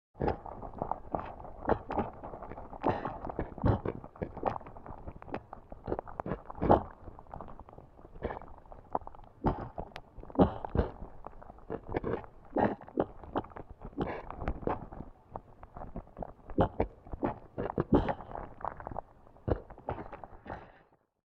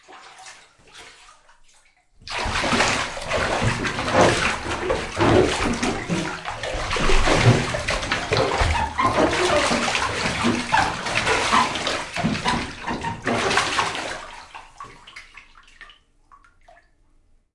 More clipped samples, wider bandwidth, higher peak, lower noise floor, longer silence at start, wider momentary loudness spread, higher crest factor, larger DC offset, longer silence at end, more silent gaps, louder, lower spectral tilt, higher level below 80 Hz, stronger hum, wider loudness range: neither; second, 6.2 kHz vs 11.5 kHz; second, -8 dBFS vs -4 dBFS; first, -65 dBFS vs -58 dBFS; about the same, 0.15 s vs 0.1 s; about the same, 19 LU vs 21 LU; first, 28 dB vs 20 dB; neither; second, 0.55 s vs 1.7 s; neither; second, -36 LUFS vs -21 LUFS; first, -10 dB/octave vs -4 dB/octave; second, -46 dBFS vs -34 dBFS; neither; about the same, 5 LU vs 6 LU